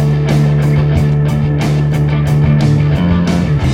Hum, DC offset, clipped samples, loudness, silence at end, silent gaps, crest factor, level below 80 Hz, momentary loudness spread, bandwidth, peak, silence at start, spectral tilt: none; under 0.1%; under 0.1%; -12 LUFS; 0 s; none; 10 dB; -24 dBFS; 2 LU; 9.6 kHz; -2 dBFS; 0 s; -8 dB/octave